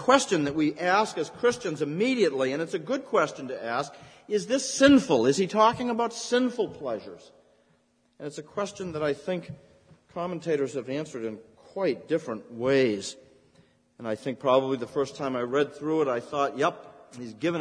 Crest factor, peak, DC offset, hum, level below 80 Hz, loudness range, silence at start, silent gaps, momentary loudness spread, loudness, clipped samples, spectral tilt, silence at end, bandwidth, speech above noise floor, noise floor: 22 dB; -4 dBFS; under 0.1%; none; -64 dBFS; 9 LU; 0 s; none; 16 LU; -27 LUFS; under 0.1%; -4.5 dB/octave; 0 s; 10.5 kHz; 40 dB; -67 dBFS